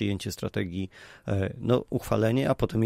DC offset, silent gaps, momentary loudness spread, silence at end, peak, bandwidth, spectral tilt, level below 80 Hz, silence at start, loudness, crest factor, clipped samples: under 0.1%; none; 10 LU; 0 s; -10 dBFS; 16 kHz; -7 dB/octave; -50 dBFS; 0 s; -28 LUFS; 18 dB; under 0.1%